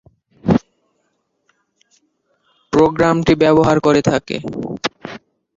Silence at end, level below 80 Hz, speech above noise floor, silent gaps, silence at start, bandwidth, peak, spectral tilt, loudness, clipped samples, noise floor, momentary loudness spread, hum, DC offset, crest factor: 0.4 s; -44 dBFS; 54 dB; none; 0.45 s; 7.8 kHz; -2 dBFS; -6.5 dB/octave; -16 LUFS; under 0.1%; -67 dBFS; 13 LU; none; under 0.1%; 16 dB